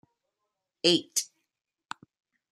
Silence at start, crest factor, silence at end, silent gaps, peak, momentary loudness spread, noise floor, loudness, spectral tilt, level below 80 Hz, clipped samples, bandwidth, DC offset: 0.85 s; 26 dB; 1.25 s; none; -6 dBFS; 20 LU; -84 dBFS; -26 LUFS; -2.5 dB/octave; -78 dBFS; under 0.1%; 15 kHz; under 0.1%